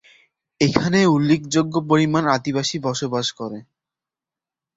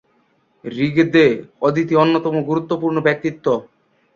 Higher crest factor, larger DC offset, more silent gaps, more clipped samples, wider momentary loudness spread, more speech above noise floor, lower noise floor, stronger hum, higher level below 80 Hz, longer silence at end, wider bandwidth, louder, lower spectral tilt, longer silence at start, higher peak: about the same, 20 dB vs 16 dB; neither; neither; neither; about the same, 9 LU vs 8 LU; first, 70 dB vs 44 dB; first, -89 dBFS vs -61 dBFS; neither; about the same, -54 dBFS vs -58 dBFS; first, 1.15 s vs 0.5 s; first, 8 kHz vs 7.2 kHz; about the same, -19 LUFS vs -17 LUFS; second, -5.5 dB/octave vs -7.5 dB/octave; about the same, 0.6 s vs 0.65 s; about the same, 0 dBFS vs -2 dBFS